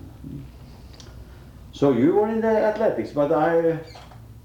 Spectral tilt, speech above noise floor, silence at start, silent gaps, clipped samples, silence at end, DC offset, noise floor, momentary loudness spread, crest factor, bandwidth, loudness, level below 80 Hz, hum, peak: -8 dB/octave; 23 dB; 0.05 s; none; under 0.1%; 0.05 s; under 0.1%; -43 dBFS; 24 LU; 16 dB; 18.5 kHz; -21 LUFS; -48 dBFS; none; -8 dBFS